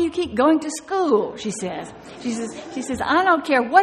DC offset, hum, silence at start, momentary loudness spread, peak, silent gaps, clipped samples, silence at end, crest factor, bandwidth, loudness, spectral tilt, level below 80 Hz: under 0.1%; none; 0 s; 13 LU; -2 dBFS; none; under 0.1%; 0 s; 20 dB; 12.5 kHz; -21 LUFS; -4 dB/octave; -54 dBFS